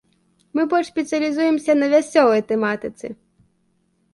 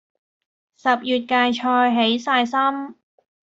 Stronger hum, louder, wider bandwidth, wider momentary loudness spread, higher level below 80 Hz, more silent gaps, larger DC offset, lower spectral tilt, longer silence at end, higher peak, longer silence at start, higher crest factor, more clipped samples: neither; about the same, -19 LUFS vs -19 LUFS; first, 11.5 kHz vs 7.8 kHz; first, 12 LU vs 7 LU; about the same, -64 dBFS vs -68 dBFS; neither; neither; about the same, -5 dB/octave vs -4 dB/octave; first, 1 s vs 0.65 s; first, -2 dBFS vs -6 dBFS; second, 0.55 s vs 0.85 s; about the same, 20 dB vs 16 dB; neither